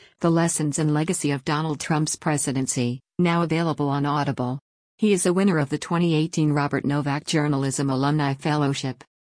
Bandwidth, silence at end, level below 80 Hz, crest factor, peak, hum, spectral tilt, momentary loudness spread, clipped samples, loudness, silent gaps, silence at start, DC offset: 10.5 kHz; 0.35 s; -60 dBFS; 14 dB; -8 dBFS; none; -5.5 dB/octave; 5 LU; under 0.1%; -23 LUFS; 4.61-4.98 s; 0.2 s; under 0.1%